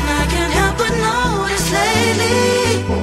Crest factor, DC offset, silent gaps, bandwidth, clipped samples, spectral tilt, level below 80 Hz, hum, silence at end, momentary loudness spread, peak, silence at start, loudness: 14 dB; under 0.1%; none; 16 kHz; under 0.1%; -4 dB/octave; -26 dBFS; none; 0 s; 3 LU; -2 dBFS; 0 s; -15 LUFS